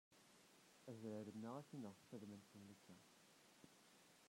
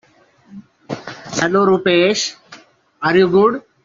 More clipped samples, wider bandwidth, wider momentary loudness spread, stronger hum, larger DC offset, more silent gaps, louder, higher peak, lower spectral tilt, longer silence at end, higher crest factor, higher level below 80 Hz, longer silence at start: neither; first, 16 kHz vs 7.6 kHz; about the same, 16 LU vs 16 LU; neither; neither; neither; second, -58 LUFS vs -15 LUFS; second, -40 dBFS vs -2 dBFS; first, -6 dB/octave vs -4.5 dB/octave; second, 0 s vs 0.25 s; about the same, 18 dB vs 16 dB; second, under -90 dBFS vs -58 dBFS; second, 0.1 s vs 0.55 s